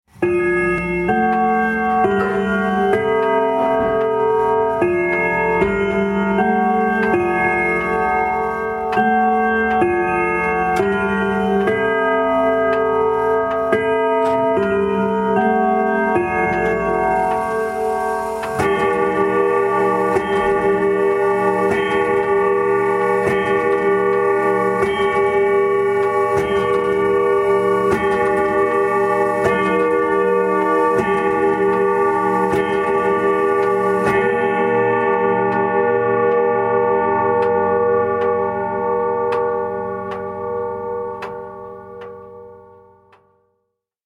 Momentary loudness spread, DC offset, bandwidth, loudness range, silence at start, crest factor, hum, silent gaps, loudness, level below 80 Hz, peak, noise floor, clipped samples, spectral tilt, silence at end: 4 LU; under 0.1%; 12.5 kHz; 2 LU; 0.2 s; 16 dB; none; none; -17 LUFS; -46 dBFS; -2 dBFS; -73 dBFS; under 0.1%; -6.5 dB/octave; 1.45 s